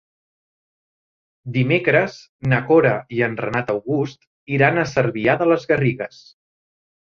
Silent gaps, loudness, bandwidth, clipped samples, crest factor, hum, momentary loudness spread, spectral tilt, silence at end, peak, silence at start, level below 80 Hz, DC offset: 2.29-2.39 s, 4.27-4.47 s; -19 LUFS; 7 kHz; under 0.1%; 18 dB; none; 11 LU; -7.5 dB/octave; 1.1 s; -2 dBFS; 1.45 s; -56 dBFS; under 0.1%